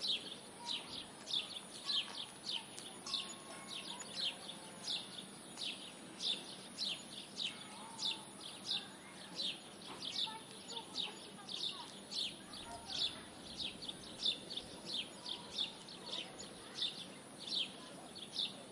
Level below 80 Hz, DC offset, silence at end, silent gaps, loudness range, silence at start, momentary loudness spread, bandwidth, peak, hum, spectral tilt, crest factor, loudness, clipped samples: -78 dBFS; under 0.1%; 0 s; none; 2 LU; 0 s; 11 LU; 11.5 kHz; -24 dBFS; none; -1.5 dB/octave; 20 dB; -42 LUFS; under 0.1%